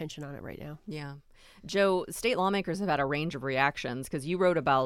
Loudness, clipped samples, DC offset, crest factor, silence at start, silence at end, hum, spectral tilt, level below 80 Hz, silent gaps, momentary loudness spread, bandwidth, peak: -29 LUFS; under 0.1%; under 0.1%; 20 dB; 0 s; 0 s; none; -5 dB/octave; -58 dBFS; none; 15 LU; 16 kHz; -10 dBFS